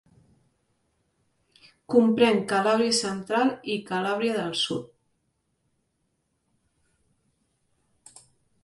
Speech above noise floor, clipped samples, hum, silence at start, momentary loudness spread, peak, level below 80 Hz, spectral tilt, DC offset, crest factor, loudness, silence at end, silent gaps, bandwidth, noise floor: 51 dB; under 0.1%; none; 1.9 s; 8 LU; -6 dBFS; -70 dBFS; -4 dB/octave; under 0.1%; 22 dB; -24 LUFS; 3.8 s; none; 11.5 kHz; -75 dBFS